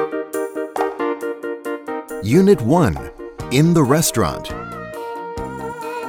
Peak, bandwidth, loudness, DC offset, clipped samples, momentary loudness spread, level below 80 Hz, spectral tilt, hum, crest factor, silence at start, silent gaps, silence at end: 0 dBFS; 18 kHz; -19 LUFS; under 0.1%; under 0.1%; 15 LU; -42 dBFS; -6 dB/octave; none; 18 dB; 0 s; none; 0 s